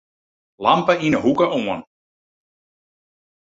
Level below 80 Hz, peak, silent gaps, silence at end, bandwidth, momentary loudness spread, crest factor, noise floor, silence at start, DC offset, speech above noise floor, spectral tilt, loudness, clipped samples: -58 dBFS; -2 dBFS; none; 1.75 s; 7.8 kHz; 9 LU; 20 dB; under -90 dBFS; 0.6 s; under 0.1%; over 72 dB; -6 dB/octave; -19 LUFS; under 0.1%